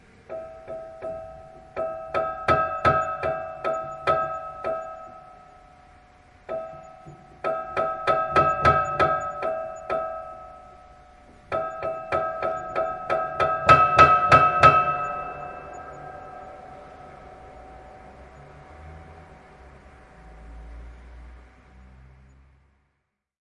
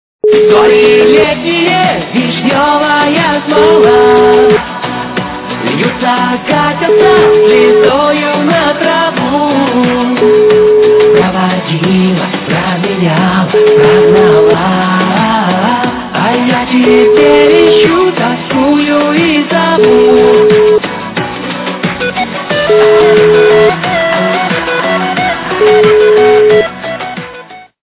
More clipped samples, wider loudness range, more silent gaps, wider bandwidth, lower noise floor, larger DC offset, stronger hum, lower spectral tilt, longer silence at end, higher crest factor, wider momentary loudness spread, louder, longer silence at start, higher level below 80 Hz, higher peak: second, under 0.1% vs 0.3%; first, 18 LU vs 2 LU; neither; first, 11 kHz vs 4 kHz; first, -77 dBFS vs -30 dBFS; neither; neither; second, -5.5 dB/octave vs -10 dB/octave; first, 2.1 s vs 0.35 s; first, 26 dB vs 8 dB; first, 28 LU vs 9 LU; second, -22 LUFS vs -8 LUFS; about the same, 0.3 s vs 0.25 s; second, -50 dBFS vs -40 dBFS; about the same, 0 dBFS vs 0 dBFS